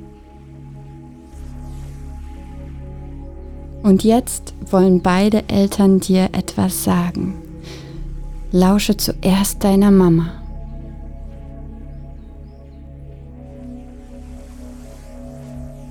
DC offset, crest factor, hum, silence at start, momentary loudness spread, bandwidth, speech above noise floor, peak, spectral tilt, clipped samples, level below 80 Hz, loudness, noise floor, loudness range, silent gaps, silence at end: under 0.1%; 16 dB; none; 0 s; 24 LU; 18.5 kHz; 25 dB; -2 dBFS; -6 dB/octave; under 0.1%; -34 dBFS; -16 LUFS; -39 dBFS; 21 LU; none; 0 s